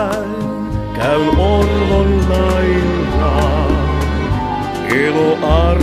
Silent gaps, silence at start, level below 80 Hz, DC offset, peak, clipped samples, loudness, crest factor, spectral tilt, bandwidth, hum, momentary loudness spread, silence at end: none; 0 s; -20 dBFS; under 0.1%; 0 dBFS; under 0.1%; -15 LUFS; 14 dB; -7 dB/octave; 13 kHz; none; 7 LU; 0 s